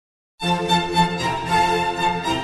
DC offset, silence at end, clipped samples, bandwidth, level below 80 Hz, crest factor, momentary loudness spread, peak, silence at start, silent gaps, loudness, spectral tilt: under 0.1%; 0 s; under 0.1%; 12.5 kHz; -44 dBFS; 16 dB; 5 LU; -6 dBFS; 0.4 s; none; -20 LUFS; -4.5 dB/octave